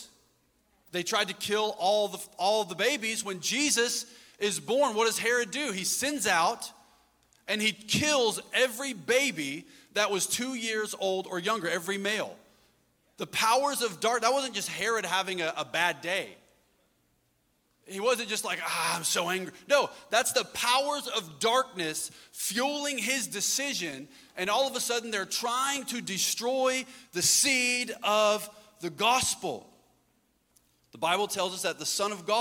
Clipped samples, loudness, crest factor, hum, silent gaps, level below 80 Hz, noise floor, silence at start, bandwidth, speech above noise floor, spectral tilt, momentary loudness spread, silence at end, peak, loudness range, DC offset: under 0.1%; -28 LUFS; 22 dB; none; none; -72 dBFS; -72 dBFS; 0 s; 17.5 kHz; 43 dB; -1.5 dB/octave; 9 LU; 0 s; -8 dBFS; 5 LU; under 0.1%